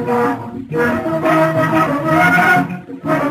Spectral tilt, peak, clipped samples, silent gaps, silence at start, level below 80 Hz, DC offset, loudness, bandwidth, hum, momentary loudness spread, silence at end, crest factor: -6.5 dB/octave; -2 dBFS; under 0.1%; none; 0 s; -50 dBFS; under 0.1%; -15 LUFS; 15.5 kHz; none; 12 LU; 0 s; 14 dB